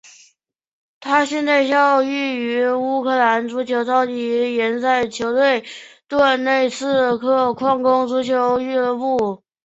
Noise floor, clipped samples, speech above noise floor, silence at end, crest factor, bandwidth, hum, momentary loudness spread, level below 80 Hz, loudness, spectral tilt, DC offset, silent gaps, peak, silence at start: -60 dBFS; under 0.1%; 42 dB; 0.3 s; 16 dB; 8 kHz; none; 6 LU; -62 dBFS; -18 LUFS; -4 dB/octave; under 0.1%; none; -2 dBFS; 1 s